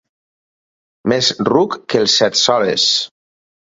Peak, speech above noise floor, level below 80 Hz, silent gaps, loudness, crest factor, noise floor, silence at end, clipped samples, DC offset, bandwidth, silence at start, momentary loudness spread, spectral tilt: 0 dBFS; over 75 dB; -58 dBFS; none; -14 LUFS; 18 dB; under -90 dBFS; 0.6 s; under 0.1%; under 0.1%; 8 kHz; 1.05 s; 6 LU; -3 dB/octave